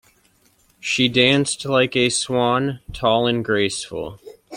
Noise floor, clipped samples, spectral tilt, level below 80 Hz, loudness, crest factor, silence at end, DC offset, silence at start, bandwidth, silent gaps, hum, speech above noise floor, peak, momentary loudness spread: -59 dBFS; under 0.1%; -4 dB/octave; -48 dBFS; -19 LUFS; 20 dB; 0 s; under 0.1%; 0.85 s; 15.5 kHz; none; none; 40 dB; -2 dBFS; 13 LU